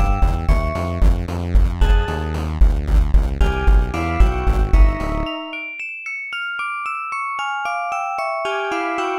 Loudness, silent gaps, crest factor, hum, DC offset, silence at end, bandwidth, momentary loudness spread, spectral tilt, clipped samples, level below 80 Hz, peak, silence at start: -21 LUFS; none; 16 dB; none; under 0.1%; 0 s; 9.4 kHz; 7 LU; -6.5 dB/octave; under 0.1%; -18 dBFS; -2 dBFS; 0 s